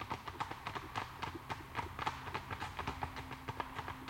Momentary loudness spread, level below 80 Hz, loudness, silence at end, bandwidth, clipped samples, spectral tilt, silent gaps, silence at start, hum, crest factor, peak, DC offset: 4 LU; -58 dBFS; -43 LUFS; 0 s; 16.5 kHz; under 0.1%; -4.5 dB/octave; none; 0 s; none; 22 dB; -22 dBFS; under 0.1%